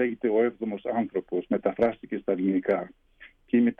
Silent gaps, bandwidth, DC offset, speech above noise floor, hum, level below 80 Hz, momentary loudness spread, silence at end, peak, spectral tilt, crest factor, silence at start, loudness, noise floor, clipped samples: none; 3.9 kHz; under 0.1%; 28 dB; none; -64 dBFS; 6 LU; 0.05 s; -10 dBFS; -9.5 dB/octave; 16 dB; 0 s; -27 LUFS; -54 dBFS; under 0.1%